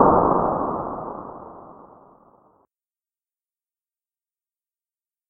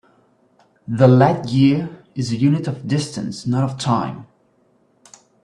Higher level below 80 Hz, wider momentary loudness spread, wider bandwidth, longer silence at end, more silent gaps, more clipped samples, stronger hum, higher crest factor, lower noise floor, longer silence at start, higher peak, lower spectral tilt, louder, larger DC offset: first, -48 dBFS vs -56 dBFS; first, 25 LU vs 15 LU; second, 2.3 kHz vs 10.5 kHz; first, 3.5 s vs 1.2 s; neither; neither; neither; first, 26 dB vs 18 dB; first, under -90 dBFS vs -59 dBFS; second, 0 s vs 0.9 s; about the same, 0 dBFS vs 0 dBFS; first, -13 dB/octave vs -7 dB/octave; second, -22 LUFS vs -18 LUFS; neither